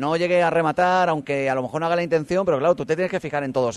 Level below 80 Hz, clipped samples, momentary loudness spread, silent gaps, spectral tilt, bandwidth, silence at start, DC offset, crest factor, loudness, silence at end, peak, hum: -58 dBFS; under 0.1%; 5 LU; none; -6 dB/octave; 11.5 kHz; 0 s; under 0.1%; 16 dB; -21 LUFS; 0 s; -6 dBFS; none